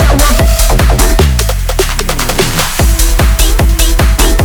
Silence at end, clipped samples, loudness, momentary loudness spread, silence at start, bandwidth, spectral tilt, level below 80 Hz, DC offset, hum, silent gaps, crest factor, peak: 0 s; 0.1%; -10 LUFS; 4 LU; 0 s; over 20 kHz; -4 dB/octave; -10 dBFS; under 0.1%; none; none; 8 dB; 0 dBFS